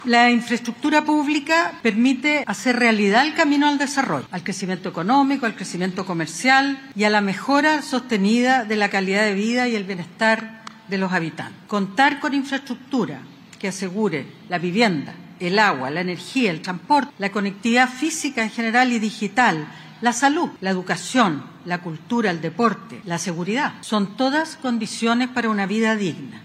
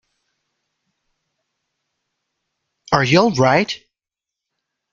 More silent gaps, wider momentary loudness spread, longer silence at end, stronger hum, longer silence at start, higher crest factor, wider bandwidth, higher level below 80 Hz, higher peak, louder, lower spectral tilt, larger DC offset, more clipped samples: neither; about the same, 10 LU vs 11 LU; second, 0 s vs 1.15 s; neither; second, 0 s vs 2.9 s; about the same, 18 dB vs 22 dB; first, 14 kHz vs 7.6 kHz; second, -70 dBFS vs -56 dBFS; about the same, -2 dBFS vs 0 dBFS; second, -20 LUFS vs -16 LUFS; about the same, -4.5 dB/octave vs -5.5 dB/octave; neither; neither